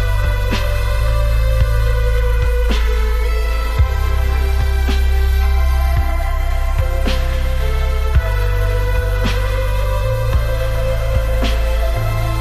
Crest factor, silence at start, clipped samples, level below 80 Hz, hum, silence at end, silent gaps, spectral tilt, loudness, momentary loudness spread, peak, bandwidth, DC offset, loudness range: 12 dB; 0 s; under 0.1%; -16 dBFS; none; 0 s; none; -6 dB/octave; -18 LUFS; 3 LU; -4 dBFS; 14 kHz; under 0.1%; 1 LU